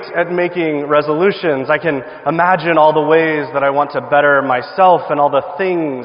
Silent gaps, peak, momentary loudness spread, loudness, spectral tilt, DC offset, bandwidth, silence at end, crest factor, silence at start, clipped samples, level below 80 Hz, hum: none; 0 dBFS; 6 LU; -14 LUFS; -9.5 dB/octave; under 0.1%; 5.4 kHz; 0 s; 14 dB; 0 s; under 0.1%; -58 dBFS; none